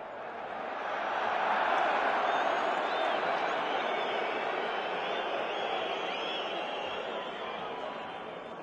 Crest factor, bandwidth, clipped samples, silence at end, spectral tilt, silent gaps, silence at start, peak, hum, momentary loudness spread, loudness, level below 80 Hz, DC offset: 16 dB; 9.6 kHz; under 0.1%; 0 s; -3.5 dB/octave; none; 0 s; -16 dBFS; none; 10 LU; -32 LUFS; -74 dBFS; under 0.1%